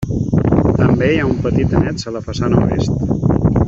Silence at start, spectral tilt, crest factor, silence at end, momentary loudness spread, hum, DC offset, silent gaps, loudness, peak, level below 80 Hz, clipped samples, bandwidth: 0 s; -8 dB/octave; 14 dB; 0 s; 6 LU; none; under 0.1%; none; -15 LUFS; -2 dBFS; -28 dBFS; under 0.1%; 7.8 kHz